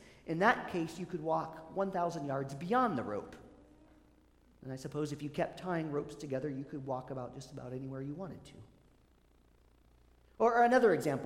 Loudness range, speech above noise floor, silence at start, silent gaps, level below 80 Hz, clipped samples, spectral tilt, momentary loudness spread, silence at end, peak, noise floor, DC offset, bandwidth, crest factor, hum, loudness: 10 LU; 32 dB; 0 s; none; -66 dBFS; under 0.1%; -6.5 dB/octave; 17 LU; 0 s; -12 dBFS; -66 dBFS; under 0.1%; 15.5 kHz; 22 dB; none; -35 LUFS